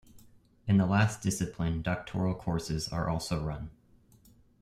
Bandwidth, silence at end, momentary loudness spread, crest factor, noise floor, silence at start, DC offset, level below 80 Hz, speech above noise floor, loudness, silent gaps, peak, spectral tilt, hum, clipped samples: 15 kHz; 0.9 s; 10 LU; 20 dB; -61 dBFS; 0.15 s; under 0.1%; -50 dBFS; 31 dB; -31 LUFS; none; -12 dBFS; -6 dB/octave; none; under 0.1%